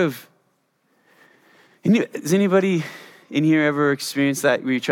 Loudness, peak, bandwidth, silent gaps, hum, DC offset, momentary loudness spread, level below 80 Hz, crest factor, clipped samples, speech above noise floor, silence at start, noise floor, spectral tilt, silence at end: -20 LUFS; -4 dBFS; 17.5 kHz; none; none; under 0.1%; 9 LU; -76 dBFS; 18 dB; under 0.1%; 47 dB; 0 s; -67 dBFS; -5.5 dB/octave; 0 s